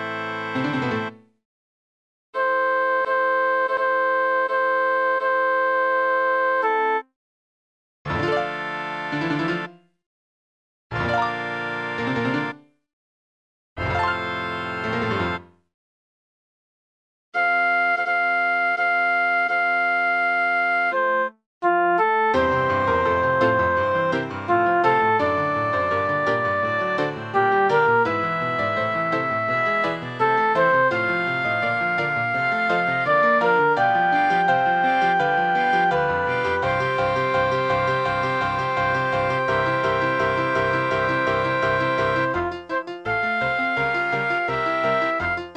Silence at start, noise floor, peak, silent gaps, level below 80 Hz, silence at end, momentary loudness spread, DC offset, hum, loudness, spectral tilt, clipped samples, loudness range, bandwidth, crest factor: 0 s; under -90 dBFS; -6 dBFS; 1.45-2.33 s, 7.16-8.05 s, 10.06-10.90 s, 12.93-13.76 s, 15.74-17.32 s, 21.46-21.61 s; -52 dBFS; 0 s; 7 LU; under 0.1%; none; -21 LUFS; -6 dB/octave; under 0.1%; 7 LU; 9.6 kHz; 16 dB